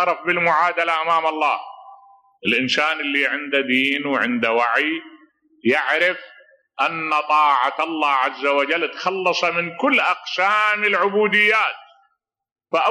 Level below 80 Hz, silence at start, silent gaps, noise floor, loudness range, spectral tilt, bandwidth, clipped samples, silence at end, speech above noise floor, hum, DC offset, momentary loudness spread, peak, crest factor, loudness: -76 dBFS; 0 s; 12.52-12.56 s; -69 dBFS; 2 LU; -4 dB/octave; 13.5 kHz; under 0.1%; 0 s; 50 dB; none; under 0.1%; 7 LU; -6 dBFS; 14 dB; -19 LUFS